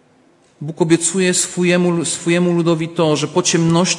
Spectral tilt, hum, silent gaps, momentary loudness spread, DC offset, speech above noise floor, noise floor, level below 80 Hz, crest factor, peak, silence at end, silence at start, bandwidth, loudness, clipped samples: -4.5 dB/octave; none; none; 4 LU; under 0.1%; 37 dB; -53 dBFS; -58 dBFS; 16 dB; 0 dBFS; 0 s; 0.6 s; 11.5 kHz; -16 LUFS; under 0.1%